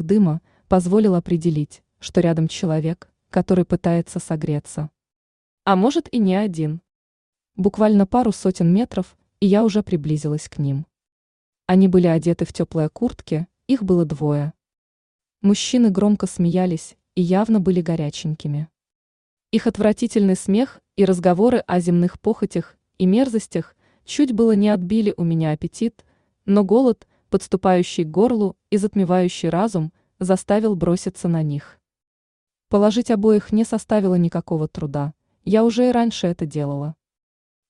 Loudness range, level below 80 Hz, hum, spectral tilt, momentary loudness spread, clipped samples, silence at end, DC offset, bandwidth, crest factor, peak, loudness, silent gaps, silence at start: 3 LU; -50 dBFS; none; -7 dB/octave; 11 LU; under 0.1%; 0.75 s; under 0.1%; 11 kHz; 16 dB; -4 dBFS; -20 LUFS; 5.16-5.58 s, 6.95-7.33 s, 11.12-11.53 s, 14.78-15.19 s, 18.95-19.37 s, 32.07-32.47 s; 0 s